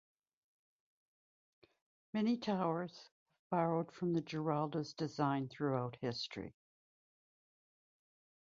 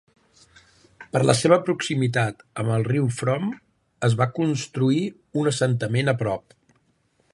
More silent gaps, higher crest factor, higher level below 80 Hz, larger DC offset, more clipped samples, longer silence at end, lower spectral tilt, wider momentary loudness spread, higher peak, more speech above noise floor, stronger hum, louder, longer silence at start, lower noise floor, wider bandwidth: first, 3.12-3.26 s, 3.39-3.50 s vs none; about the same, 20 dB vs 22 dB; second, -78 dBFS vs -60 dBFS; neither; neither; first, 1.95 s vs 0.95 s; about the same, -6 dB/octave vs -6 dB/octave; about the same, 9 LU vs 9 LU; second, -20 dBFS vs -2 dBFS; first, over 52 dB vs 44 dB; neither; second, -39 LUFS vs -23 LUFS; first, 2.15 s vs 1 s; first, under -90 dBFS vs -66 dBFS; second, 7.4 kHz vs 11.5 kHz